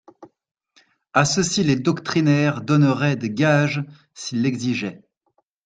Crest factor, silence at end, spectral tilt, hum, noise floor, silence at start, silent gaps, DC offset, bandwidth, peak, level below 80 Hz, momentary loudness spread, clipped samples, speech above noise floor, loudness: 20 dB; 0.7 s; -5.5 dB/octave; none; -69 dBFS; 0.2 s; none; under 0.1%; 9.4 kHz; -2 dBFS; -58 dBFS; 11 LU; under 0.1%; 49 dB; -20 LUFS